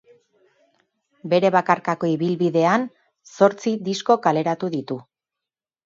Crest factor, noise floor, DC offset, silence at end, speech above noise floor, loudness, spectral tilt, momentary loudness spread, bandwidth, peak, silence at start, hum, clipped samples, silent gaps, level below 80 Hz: 20 dB; -88 dBFS; under 0.1%; 0.85 s; 68 dB; -20 LUFS; -6 dB/octave; 11 LU; 7.8 kHz; -2 dBFS; 1.25 s; none; under 0.1%; none; -72 dBFS